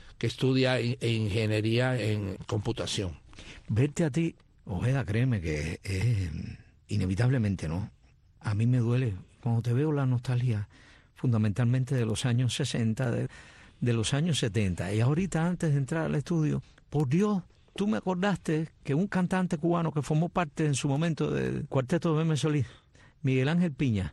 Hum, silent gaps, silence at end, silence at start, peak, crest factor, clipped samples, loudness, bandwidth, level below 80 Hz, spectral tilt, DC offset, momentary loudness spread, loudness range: none; none; 0 s; 0.05 s; -14 dBFS; 14 dB; under 0.1%; -29 LUFS; 12 kHz; -52 dBFS; -6.5 dB/octave; under 0.1%; 7 LU; 2 LU